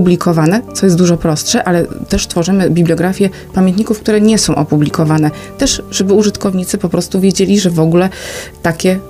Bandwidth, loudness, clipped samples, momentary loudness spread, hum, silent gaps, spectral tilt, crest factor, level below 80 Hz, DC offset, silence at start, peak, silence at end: 16 kHz; -12 LUFS; under 0.1%; 6 LU; none; none; -5.5 dB/octave; 12 dB; -34 dBFS; under 0.1%; 0 s; 0 dBFS; 0 s